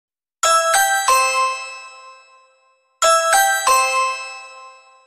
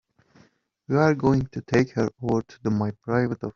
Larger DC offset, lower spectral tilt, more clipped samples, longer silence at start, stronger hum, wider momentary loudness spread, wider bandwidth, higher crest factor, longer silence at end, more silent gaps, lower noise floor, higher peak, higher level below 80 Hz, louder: neither; second, 3 dB/octave vs -7.5 dB/octave; neither; second, 0.45 s vs 0.9 s; neither; first, 16 LU vs 6 LU; first, 16 kHz vs 7.6 kHz; about the same, 16 dB vs 20 dB; first, 0.35 s vs 0.05 s; neither; about the same, -59 dBFS vs -60 dBFS; first, -2 dBFS vs -6 dBFS; second, -62 dBFS vs -52 dBFS; first, -16 LUFS vs -24 LUFS